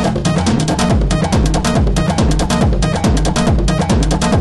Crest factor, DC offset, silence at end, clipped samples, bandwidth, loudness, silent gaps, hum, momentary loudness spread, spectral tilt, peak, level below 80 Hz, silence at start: 12 dB; under 0.1%; 0 s; under 0.1%; 12 kHz; -14 LUFS; none; none; 1 LU; -5.5 dB/octave; 0 dBFS; -18 dBFS; 0 s